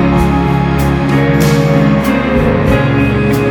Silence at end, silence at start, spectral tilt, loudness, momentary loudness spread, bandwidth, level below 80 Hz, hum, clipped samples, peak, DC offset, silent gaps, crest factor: 0 s; 0 s; -7 dB/octave; -11 LUFS; 2 LU; 19.5 kHz; -22 dBFS; none; under 0.1%; 0 dBFS; under 0.1%; none; 10 dB